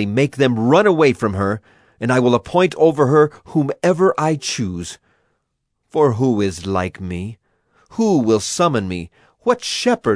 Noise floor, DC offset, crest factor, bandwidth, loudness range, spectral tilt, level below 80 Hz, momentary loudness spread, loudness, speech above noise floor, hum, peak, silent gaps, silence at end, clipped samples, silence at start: -72 dBFS; under 0.1%; 18 dB; 11 kHz; 6 LU; -5.5 dB/octave; -52 dBFS; 13 LU; -17 LUFS; 56 dB; none; 0 dBFS; none; 0 s; under 0.1%; 0 s